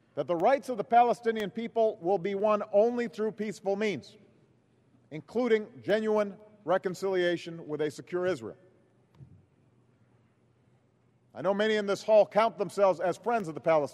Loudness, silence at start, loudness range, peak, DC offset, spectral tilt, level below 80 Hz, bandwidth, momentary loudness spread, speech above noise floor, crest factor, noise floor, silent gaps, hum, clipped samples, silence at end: -29 LUFS; 0.15 s; 10 LU; -12 dBFS; under 0.1%; -5.5 dB/octave; -78 dBFS; 12.5 kHz; 10 LU; 39 dB; 18 dB; -67 dBFS; none; none; under 0.1%; 0 s